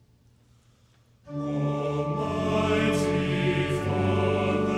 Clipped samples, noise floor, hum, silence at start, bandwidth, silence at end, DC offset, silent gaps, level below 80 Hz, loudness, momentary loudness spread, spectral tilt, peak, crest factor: under 0.1%; -60 dBFS; none; 1.25 s; 13 kHz; 0 s; under 0.1%; none; -50 dBFS; -26 LUFS; 5 LU; -6.5 dB/octave; -14 dBFS; 14 dB